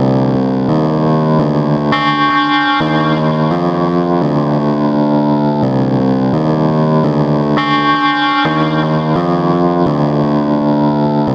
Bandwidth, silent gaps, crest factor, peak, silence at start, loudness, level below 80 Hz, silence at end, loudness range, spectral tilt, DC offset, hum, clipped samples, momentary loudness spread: 7 kHz; none; 12 dB; 0 dBFS; 0 s; -13 LUFS; -44 dBFS; 0 s; 1 LU; -8 dB/octave; under 0.1%; none; under 0.1%; 2 LU